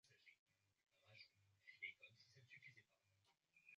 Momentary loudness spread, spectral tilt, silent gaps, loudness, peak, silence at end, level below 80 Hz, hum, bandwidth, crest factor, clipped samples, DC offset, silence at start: 12 LU; -0.5 dB/octave; 0.39-0.46 s; -61 LUFS; -42 dBFS; 0 s; under -90 dBFS; none; 7.4 kHz; 26 dB; under 0.1%; under 0.1%; 0.05 s